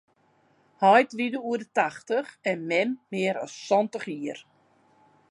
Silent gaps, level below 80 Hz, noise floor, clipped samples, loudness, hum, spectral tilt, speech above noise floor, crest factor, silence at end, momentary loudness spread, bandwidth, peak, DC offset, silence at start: none; -82 dBFS; -65 dBFS; under 0.1%; -26 LUFS; none; -5 dB/octave; 39 dB; 20 dB; 0.9 s; 14 LU; 11 kHz; -6 dBFS; under 0.1%; 0.8 s